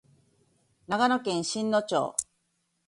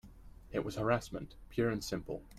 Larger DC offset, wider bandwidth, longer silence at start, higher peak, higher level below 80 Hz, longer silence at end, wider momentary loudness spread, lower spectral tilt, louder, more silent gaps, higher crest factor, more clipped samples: neither; second, 11.5 kHz vs 15.5 kHz; first, 0.9 s vs 0.05 s; first, -8 dBFS vs -18 dBFS; second, -70 dBFS vs -54 dBFS; first, 0.65 s vs 0 s; about the same, 8 LU vs 9 LU; second, -3.5 dB/octave vs -6 dB/octave; first, -28 LUFS vs -37 LUFS; neither; about the same, 22 dB vs 20 dB; neither